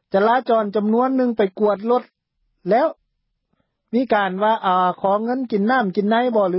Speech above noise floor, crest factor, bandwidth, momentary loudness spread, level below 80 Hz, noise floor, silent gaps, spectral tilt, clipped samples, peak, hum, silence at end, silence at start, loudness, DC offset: 55 dB; 14 dB; 5.8 kHz; 5 LU; -68 dBFS; -73 dBFS; none; -11 dB/octave; under 0.1%; -6 dBFS; none; 0 s; 0.15 s; -19 LUFS; under 0.1%